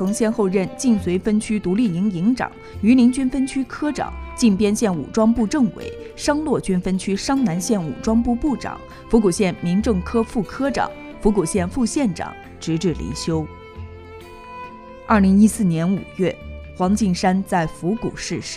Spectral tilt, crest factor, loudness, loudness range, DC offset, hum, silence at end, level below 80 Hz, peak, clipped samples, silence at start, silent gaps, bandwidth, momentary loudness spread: -6 dB/octave; 18 dB; -20 LUFS; 4 LU; under 0.1%; none; 0 s; -38 dBFS; -2 dBFS; under 0.1%; 0 s; none; 13.5 kHz; 16 LU